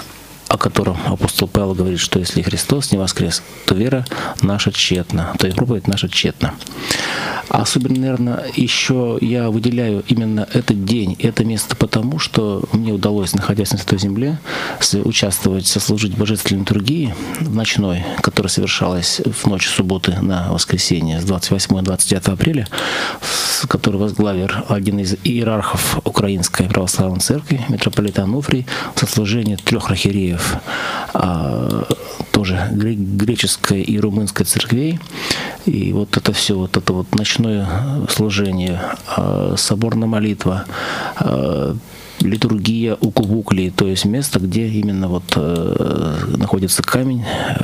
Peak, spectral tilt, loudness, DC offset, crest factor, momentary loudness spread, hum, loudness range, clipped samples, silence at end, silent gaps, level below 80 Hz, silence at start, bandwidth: 0 dBFS; -4.5 dB/octave; -17 LUFS; under 0.1%; 16 dB; 5 LU; none; 2 LU; under 0.1%; 0 s; none; -40 dBFS; 0 s; 16 kHz